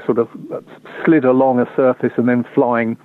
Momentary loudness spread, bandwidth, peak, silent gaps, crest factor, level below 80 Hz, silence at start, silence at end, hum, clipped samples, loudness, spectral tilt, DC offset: 17 LU; 4.1 kHz; -4 dBFS; none; 12 dB; -64 dBFS; 0 s; 0.1 s; none; under 0.1%; -16 LUFS; -10 dB/octave; under 0.1%